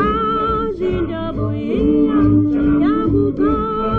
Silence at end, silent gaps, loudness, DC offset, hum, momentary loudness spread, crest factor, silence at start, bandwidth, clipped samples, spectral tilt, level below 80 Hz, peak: 0 s; none; -17 LUFS; under 0.1%; none; 7 LU; 12 dB; 0 s; 4.5 kHz; under 0.1%; -10 dB/octave; -30 dBFS; -4 dBFS